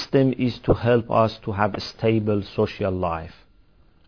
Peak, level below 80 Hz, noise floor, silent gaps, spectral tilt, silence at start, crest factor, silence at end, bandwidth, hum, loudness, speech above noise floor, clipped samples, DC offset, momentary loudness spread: -4 dBFS; -46 dBFS; -57 dBFS; none; -8 dB/octave; 0 s; 18 dB; 0.8 s; 5.4 kHz; none; -23 LUFS; 35 dB; under 0.1%; 0.2%; 7 LU